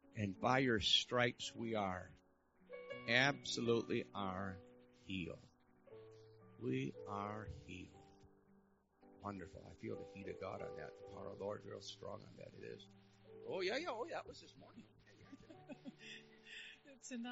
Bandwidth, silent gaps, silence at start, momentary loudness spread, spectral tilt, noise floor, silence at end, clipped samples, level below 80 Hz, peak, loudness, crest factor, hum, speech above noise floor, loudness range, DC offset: 7.6 kHz; none; 0.05 s; 25 LU; -2.5 dB/octave; -73 dBFS; 0 s; under 0.1%; -72 dBFS; -20 dBFS; -42 LUFS; 24 dB; none; 30 dB; 14 LU; under 0.1%